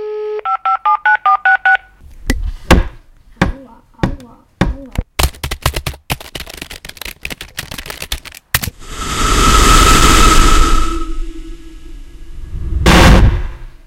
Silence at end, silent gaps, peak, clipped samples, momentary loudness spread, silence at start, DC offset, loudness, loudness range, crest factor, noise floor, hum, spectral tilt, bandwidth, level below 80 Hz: 0.15 s; none; 0 dBFS; 0.5%; 20 LU; 0 s; under 0.1%; -13 LUFS; 10 LU; 14 dB; -39 dBFS; none; -3.5 dB/octave; 17.5 kHz; -16 dBFS